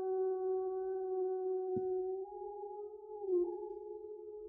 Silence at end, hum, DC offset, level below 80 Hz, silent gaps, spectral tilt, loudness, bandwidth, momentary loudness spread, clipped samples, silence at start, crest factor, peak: 0 s; none; under 0.1%; -76 dBFS; none; -5.5 dB/octave; -39 LUFS; 1.6 kHz; 12 LU; under 0.1%; 0 s; 12 dB; -26 dBFS